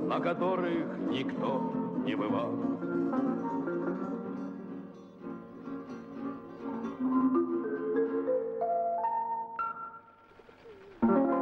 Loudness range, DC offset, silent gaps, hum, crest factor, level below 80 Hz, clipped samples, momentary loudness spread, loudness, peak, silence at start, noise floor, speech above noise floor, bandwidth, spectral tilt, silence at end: 6 LU; under 0.1%; none; none; 16 dB; -70 dBFS; under 0.1%; 15 LU; -32 LUFS; -16 dBFS; 0 s; -56 dBFS; 25 dB; 6.2 kHz; -8.5 dB/octave; 0 s